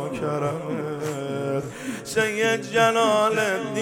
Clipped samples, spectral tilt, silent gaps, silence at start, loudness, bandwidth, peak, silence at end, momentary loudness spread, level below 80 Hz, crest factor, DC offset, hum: under 0.1%; -4.5 dB/octave; none; 0 s; -23 LUFS; 17.5 kHz; -6 dBFS; 0 s; 10 LU; -62 dBFS; 18 dB; under 0.1%; none